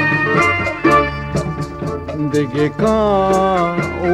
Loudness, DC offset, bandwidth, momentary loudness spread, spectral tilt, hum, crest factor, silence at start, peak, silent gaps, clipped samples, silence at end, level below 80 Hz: -16 LUFS; under 0.1%; 13.5 kHz; 10 LU; -6.5 dB/octave; none; 14 dB; 0 s; -2 dBFS; none; under 0.1%; 0 s; -36 dBFS